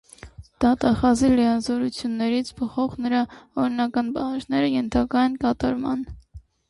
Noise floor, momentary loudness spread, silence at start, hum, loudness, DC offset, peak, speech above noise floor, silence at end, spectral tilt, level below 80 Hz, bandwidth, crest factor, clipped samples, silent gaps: -44 dBFS; 8 LU; 0.25 s; none; -23 LUFS; under 0.1%; -8 dBFS; 22 dB; 0.3 s; -5.5 dB/octave; -44 dBFS; 11.5 kHz; 14 dB; under 0.1%; none